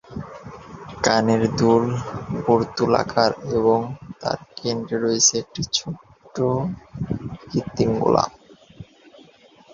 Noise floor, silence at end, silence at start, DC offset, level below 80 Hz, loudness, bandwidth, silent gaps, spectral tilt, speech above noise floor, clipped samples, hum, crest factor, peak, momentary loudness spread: -51 dBFS; 0.9 s; 0.1 s; under 0.1%; -50 dBFS; -21 LUFS; 7.6 kHz; none; -4.5 dB/octave; 30 dB; under 0.1%; none; 22 dB; 0 dBFS; 17 LU